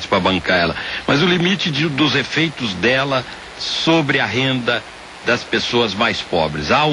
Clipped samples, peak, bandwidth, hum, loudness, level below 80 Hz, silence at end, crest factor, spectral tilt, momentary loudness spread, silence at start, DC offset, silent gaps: under 0.1%; -2 dBFS; 11.5 kHz; none; -17 LUFS; -46 dBFS; 0 s; 16 dB; -4.5 dB/octave; 7 LU; 0 s; under 0.1%; none